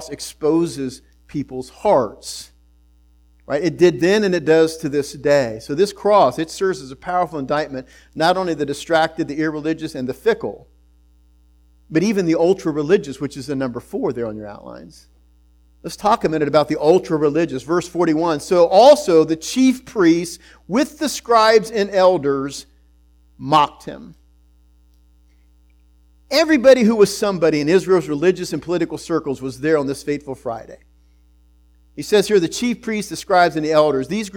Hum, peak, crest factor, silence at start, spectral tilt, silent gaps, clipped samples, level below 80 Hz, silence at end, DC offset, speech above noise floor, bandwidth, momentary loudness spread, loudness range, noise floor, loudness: none; 0 dBFS; 18 dB; 0 s; -5 dB/octave; none; under 0.1%; -50 dBFS; 0 s; under 0.1%; 35 dB; 18 kHz; 14 LU; 8 LU; -53 dBFS; -18 LUFS